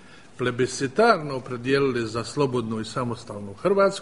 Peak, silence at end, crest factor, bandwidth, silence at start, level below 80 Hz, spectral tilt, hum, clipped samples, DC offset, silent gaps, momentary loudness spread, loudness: -4 dBFS; 0 s; 20 dB; 11 kHz; 0.05 s; -56 dBFS; -5.5 dB/octave; none; under 0.1%; 0.3%; none; 11 LU; -24 LUFS